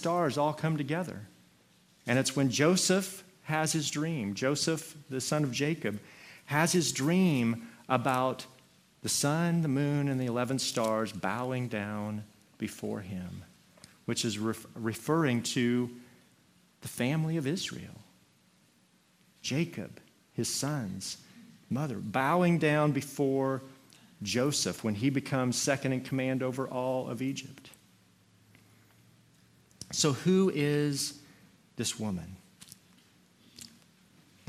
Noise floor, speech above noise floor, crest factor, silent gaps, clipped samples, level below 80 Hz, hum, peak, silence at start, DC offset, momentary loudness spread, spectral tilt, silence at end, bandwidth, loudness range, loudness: -66 dBFS; 36 dB; 22 dB; none; under 0.1%; -72 dBFS; none; -10 dBFS; 0 s; under 0.1%; 17 LU; -4.5 dB/octave; 0.8 s; 15.5 kHz; 7 LU; -31 LUFS